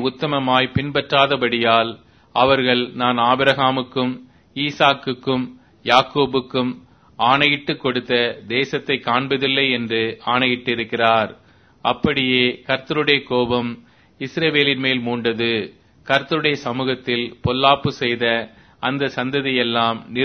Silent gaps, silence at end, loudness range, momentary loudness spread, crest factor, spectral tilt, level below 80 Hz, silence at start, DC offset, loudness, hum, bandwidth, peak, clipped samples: none; 0 s; 2 LU; 9 LU; 20 dB; -6 dB/octave; -52 dBFS; 0 s; under 0.1%; -19 LUFS; none; 6.6 kHz; 0 dBFS; under 0.1%